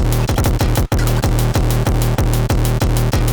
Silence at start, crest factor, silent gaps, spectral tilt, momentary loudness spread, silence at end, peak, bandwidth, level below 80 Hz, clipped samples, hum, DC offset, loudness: 0 s; 12 dB; none; -5.5 dB/octave; 1 LU; 0 s; -2 dBFS; over 20 kHz; -18 dBFS; under 0.1%; none; under 0.1%; -17 LUFS